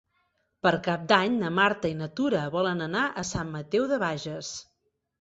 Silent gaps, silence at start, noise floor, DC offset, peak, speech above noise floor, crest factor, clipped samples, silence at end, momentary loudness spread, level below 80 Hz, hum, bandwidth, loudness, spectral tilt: none; 0.65 s; -73 dBFS; under 0.1%; -4 dBFS; 46 dB; 24 dB; under 0.1%; 0.6 s; 11 LU; -58 dBFS; none; 8 kHz; -27 LUFS; -5 dB/octave